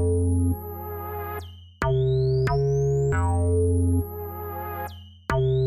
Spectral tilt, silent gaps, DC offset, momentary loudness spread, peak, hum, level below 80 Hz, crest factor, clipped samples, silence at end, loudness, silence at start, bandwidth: -7.5 dB/octave; none; under 0.1%; 12 LU; -10 dBFS; none; -36 dBFS; 14 dB; under 0.1%; 0 s; -25 LUFS; 0 s; 13 kHz